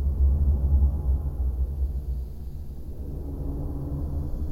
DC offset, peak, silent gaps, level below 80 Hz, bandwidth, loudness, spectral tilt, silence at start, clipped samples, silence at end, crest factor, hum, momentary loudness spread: under 0.1%; -12 dBFS; none; -26 dBFS; 1.4 kHz; -28 LUFS; -10.5 dB/octave; 0 s; under 0.1%; 0 s; 14 dB; none; 14 LU